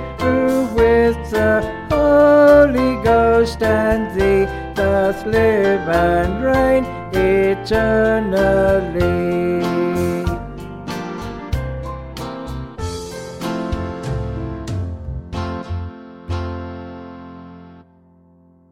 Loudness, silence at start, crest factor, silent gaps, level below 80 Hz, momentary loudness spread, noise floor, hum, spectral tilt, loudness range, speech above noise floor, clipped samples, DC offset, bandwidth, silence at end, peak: -17 LUFS; 0 s; 16 dB; none; -32 dBFS; 16 LU; -51 dBFS; none; -7 dB/octave; 14 LU; 35 dB; under 0.1%; under 0.1%; 16 kHz; 0.9 s; 0 dBFS